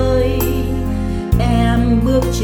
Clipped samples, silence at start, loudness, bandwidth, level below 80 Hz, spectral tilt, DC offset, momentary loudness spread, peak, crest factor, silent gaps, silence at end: under 0.1%; 0 s; -16 LUFS; over 20 kHz; -20 dBFS; -7 dB/octave; under 0.1%; 6 LU; -2 dBFS; 14 dB; none; 0 s